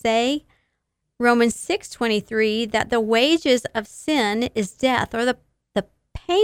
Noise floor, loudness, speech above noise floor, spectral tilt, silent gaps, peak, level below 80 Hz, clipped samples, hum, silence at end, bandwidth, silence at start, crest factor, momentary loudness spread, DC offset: -76 dBFS; -21 LUFS; 56 dB; -3.5 dB/octave; none; -4 dBFS; -50 dBFS; under 0.1%; none; 0 s; 16 kHz; 0.05 s; 18 dB; 11 LU; under 0.1%